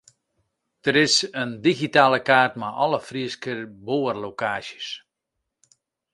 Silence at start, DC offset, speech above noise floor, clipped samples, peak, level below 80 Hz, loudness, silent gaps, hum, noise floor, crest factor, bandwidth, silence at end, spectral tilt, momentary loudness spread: 0.85 s; under 0.1%; 59 dB; under 0.1%; -2 dBFS; -66 dBFS; -22 LUFS; none; none; -81 dBFS; 22 dB; 11.5 kHz; 1.15 s; -3.5 dB/octave; 14 LU